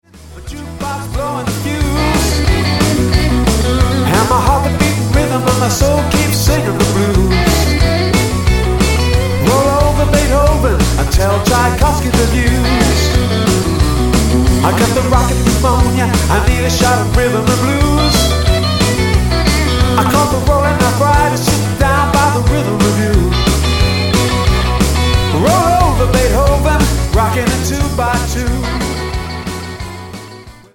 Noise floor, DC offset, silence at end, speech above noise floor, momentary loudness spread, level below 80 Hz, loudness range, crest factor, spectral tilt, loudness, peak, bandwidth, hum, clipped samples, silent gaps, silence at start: -34 dBFS; under 0.1%; 0.25 s; 23 dB; 6 LU; -18 dBFS; 2 LU; 12 dB; -5 dB/octave; -13 LUFS; 0 dBFS; 17.5 kHz; none; under 0.1%; none; 0.15 s